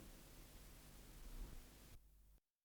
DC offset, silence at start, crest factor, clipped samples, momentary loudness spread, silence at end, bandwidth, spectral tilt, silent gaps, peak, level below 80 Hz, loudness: under 0.1%; 0 s; 16 dB; under 0.1%; 6 LU; 0.25 s; over 20 kHz; -4 dB/octave; none; -42 dBFS; -60 dBFS; -62 LUFS